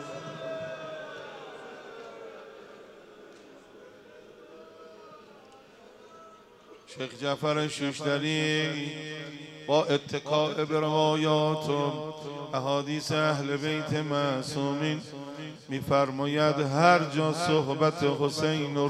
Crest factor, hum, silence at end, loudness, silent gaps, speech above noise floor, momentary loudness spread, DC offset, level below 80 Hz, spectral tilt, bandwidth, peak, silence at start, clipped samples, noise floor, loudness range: 22 dB; none; 0 s; -28 LUFS; none; 26 dB; 19 LU; under 0.1%; -70 dBFS; -5.5 dB/octave; 13.5 kHz; -8 dBFS; 0 s; under 0.1%; -53 dBFS; 20 LU